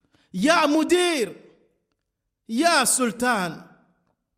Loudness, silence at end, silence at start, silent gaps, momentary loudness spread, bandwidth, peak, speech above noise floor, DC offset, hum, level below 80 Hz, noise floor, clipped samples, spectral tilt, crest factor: -21 LUFS; 0.75 s; 0.35 s; none; 12 LU; 16 kHz; -6 dBFS; 59 dB; under 0.1%; none; -64 dBFS; -80 dBFS; under 0.1%; -2.5 dB/octave; 18 dB